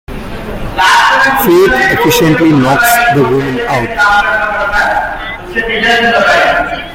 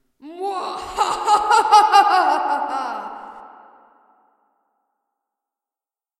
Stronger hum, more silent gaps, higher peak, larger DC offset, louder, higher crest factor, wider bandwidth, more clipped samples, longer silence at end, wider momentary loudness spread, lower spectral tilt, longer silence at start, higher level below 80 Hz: neither; neither; about the same, 0 dBFS vs 0 dBFS; neither; first, -9 LUFS vs -17 LUFS; second, 10 dB vs 20 dB; first, 17.5 kHz vs 13.5 kHz; neither; second, 0 s vs 2.7 s; second, 11 LU vs 18 LU; first, -4 dB/octave vs -1 dB/octave; second, 0.1 s vs 0.25 s; first, -30 dBFS vs -58 dBFS